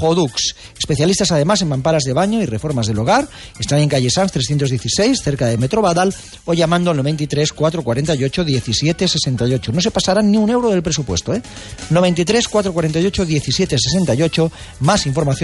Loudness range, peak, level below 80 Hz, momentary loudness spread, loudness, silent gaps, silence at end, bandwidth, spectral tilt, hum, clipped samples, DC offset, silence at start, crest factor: 1 LU; -4 dBFS; -38 dBFS; 5 LU; -16 LUFS; none; 0 s; 11.5 kHz; -5 dB/octave; none; under 0.1%; under 0.1%; 0 s; 12 dB